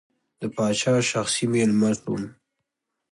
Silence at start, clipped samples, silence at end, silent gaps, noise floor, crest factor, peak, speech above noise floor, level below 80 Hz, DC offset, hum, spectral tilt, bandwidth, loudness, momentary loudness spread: 0.4 s; under 0.1%; 0.8 s; none; -81 dBFS; 14 dB; -10 dBFS; 58 dB; -62 dBFS; under 0.1%; none; -4.5 dB/octave; 11.5 kHz; -23 LUFS; 12 LU